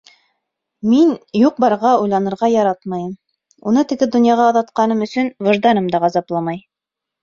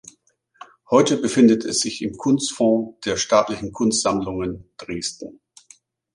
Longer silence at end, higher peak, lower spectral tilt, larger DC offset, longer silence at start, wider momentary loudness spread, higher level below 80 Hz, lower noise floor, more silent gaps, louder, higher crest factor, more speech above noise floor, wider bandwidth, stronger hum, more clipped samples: second, 0.65 s vs 0.85 s; about the same, -2 dBFS vs -2 dBFS; first, -6.5 dB/octave vs -4 dB/octave; neither; about the same, 0.85 s vs 0.9 s; about the same, 11 LU vs 13 LU; second, -60 dBFS vs -52 dBFS; first, -84 dBFS vs -62 dBFS; neither; first, -16 LUFS vs -20 LUFS; second, 14 dB vs 20 dB; first, 69 dB vs 42 dB; second, 7.4 kHz vs 11.5 kHz; neither; neither